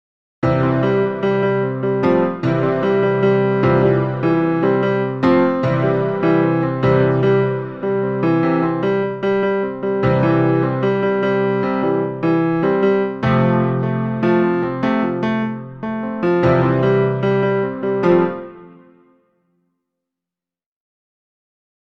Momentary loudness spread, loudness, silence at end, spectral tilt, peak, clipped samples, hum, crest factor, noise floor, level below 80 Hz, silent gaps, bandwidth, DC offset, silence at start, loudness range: 5 LU; -17 LUFS; 3.15 s; -9.5 dB/octave; -2 dBFS; under 0.1%; none; 16 dB; -89 dBFS; -48 dBFS; none; 6.2 kHz; 0.2%; 0.4 s; 2 LU